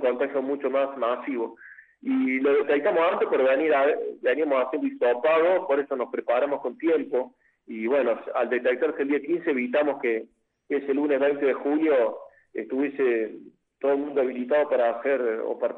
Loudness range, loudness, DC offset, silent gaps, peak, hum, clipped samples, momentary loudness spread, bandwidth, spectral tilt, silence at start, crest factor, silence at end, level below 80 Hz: 3 LU; -25 LUFS; under 0.1%; none; -12 dBFS; none; under 0.1%; 8 LU; 4.2 kHz; -7.5 dB/octave; 0 s; 14 dB; 0 s; -78 dBFS